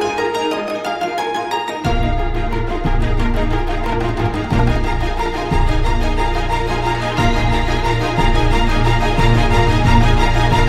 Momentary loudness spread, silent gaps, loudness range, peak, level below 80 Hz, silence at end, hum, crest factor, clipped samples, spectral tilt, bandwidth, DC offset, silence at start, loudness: 6 LU; none; 4 LU; 0 dBFS; -18 dBFS; 0 s; none; 14 dB; under 0.1%; -6 dB/octave; 12.5 kHz; under 0.1%; 0 s; -18 LUFS